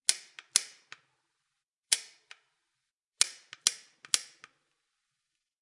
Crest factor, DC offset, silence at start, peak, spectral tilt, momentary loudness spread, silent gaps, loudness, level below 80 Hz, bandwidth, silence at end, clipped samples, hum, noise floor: 34 dB; under 0.1%; 0.1 s; -2 dBFS; 4 dB/octave; 18 LU; 1.64-1.83 s, 2.93-3.00 s, 3.06-3.11 s; -30 LUFS; under -90 dBFS; 11.5 kHz; 1.4 s; under 0.1%; none; -86 dBFS